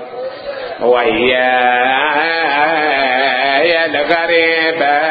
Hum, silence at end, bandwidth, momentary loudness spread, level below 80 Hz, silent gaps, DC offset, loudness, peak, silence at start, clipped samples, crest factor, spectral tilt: none; 0 s; 5 kHz; 9 LU; -52 dBFS; none; under 0.1%; -12 LUFS; 0 dBFS; 0 s; under 0.1%; 14 dB; -6.5 dB/octave